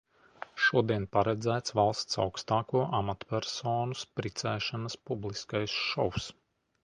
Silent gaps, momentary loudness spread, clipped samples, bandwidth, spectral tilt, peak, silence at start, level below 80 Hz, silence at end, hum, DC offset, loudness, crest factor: none; 9 LU; under 0.1%; 10.5 kHz; -4.5 dB/octave; -10 dBFS; 0.55 s; -58 dBFS; 0.5 s; none; under 0.1%; -31 LUFS; 20 dB